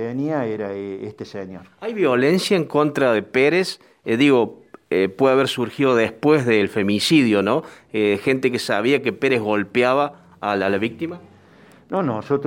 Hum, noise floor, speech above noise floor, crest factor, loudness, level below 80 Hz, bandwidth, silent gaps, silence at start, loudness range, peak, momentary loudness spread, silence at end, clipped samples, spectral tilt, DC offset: none; -49 dBFS; 30 dB; 16 dB; -19 LUFS; -64 dBFS; 16.5 kHz; none; 0 s; 3 LU; -4 dBFS; 14 LU; 0 s; under 0.1%; -5.5 dB/octave; under 0.1%